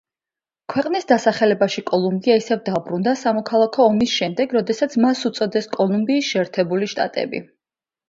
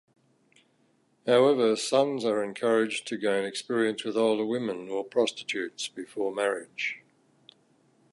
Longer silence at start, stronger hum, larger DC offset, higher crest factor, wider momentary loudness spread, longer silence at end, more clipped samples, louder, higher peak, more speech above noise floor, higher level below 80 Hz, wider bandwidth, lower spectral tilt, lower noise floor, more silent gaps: second, 0.7 s vs 1.25 s; neither; neither; about the same, 18 dB vs 18 dB; second, 7 LU vs 10 LU; second, 0.65 s vs 1.15 s; neither; first, -19 LUFS vs -28 LUFS; first, -2 dBFS vs -10 dBFS; first, over 71 dB vs 41 dB; first, -62 dBFS vs -82 dBFS; second, 7.8 kHz vs 11.5 kHz; about the same, -5 dB/octave vs -4 dB/octave; first, under -90 dBFS vs -68 dBFS; neither